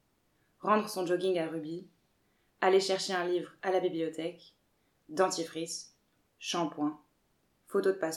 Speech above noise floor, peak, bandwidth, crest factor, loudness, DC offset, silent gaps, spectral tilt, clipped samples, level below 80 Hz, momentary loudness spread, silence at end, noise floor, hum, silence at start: 42 dB; -12 dBFS; 14.5 kHz; 22 dB; -32 LUFS; under 0.1%; none; -4 dB/octave; under 0.1%; -84 dBFS; 13 LU; 0 s; -74 dBFS; none; 0.65 s